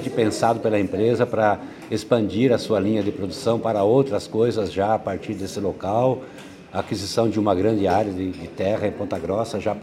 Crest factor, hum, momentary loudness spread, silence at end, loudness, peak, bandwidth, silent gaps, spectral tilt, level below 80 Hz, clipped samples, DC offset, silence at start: 18 dB; none; 9 LU; 0 s; -22 LUFS; -4 dBFS; 15.5 kHz; none; -6.5 dB/octave; -56 dBFS; under 0.1%; under 0.1%; 0 s